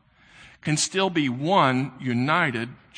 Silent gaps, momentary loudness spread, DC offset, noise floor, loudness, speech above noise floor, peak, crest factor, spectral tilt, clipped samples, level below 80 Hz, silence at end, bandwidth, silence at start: none; 7 LU; under 0.1%; -52 dBFS; -23 LUFS; 28 dB; -6 dBFS; 18 dB; -4.5 dB/octave; under 0.1%; -64 dBFS; 0.2 s; 10 kHz; 0.4 s